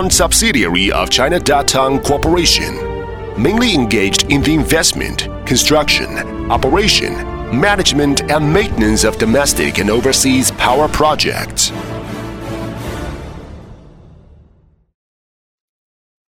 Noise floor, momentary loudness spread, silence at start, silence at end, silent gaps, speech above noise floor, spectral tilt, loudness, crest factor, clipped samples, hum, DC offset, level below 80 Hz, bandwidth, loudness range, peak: -50 dBFS; 14 LU; 0 s; 2.4 s; none; 37 dB; -3.5 dB/octave; -13 LUFS; 14 dB; under 0.1%; none; under 0.1%; -28 dBFS; over 20 kHz; 11 LU; 0 dBFS